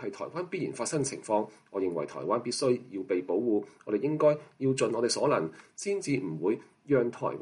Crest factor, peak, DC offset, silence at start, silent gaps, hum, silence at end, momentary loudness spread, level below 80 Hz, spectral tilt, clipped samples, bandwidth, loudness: 16 dB; -14 dBFS; under 0.1%; 0 s; none; none; 0 s; 8 LU; -74 dBFS; -5 dB/octave; under 0.1%; 11.5 kHz; -30 LUFS